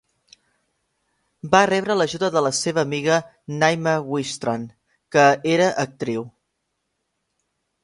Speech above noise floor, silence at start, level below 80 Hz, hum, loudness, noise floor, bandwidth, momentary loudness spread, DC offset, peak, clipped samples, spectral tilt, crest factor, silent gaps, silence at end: 56 dB; 1.45 s; -62 dBFS; none; -20 LUFS; -76 dBFS; 11.5 kHz; 13 LU; under 0.1%; 0 dBFS; under 0.1%; -4.5 dB/octave; 22 dB; none; 1.55 s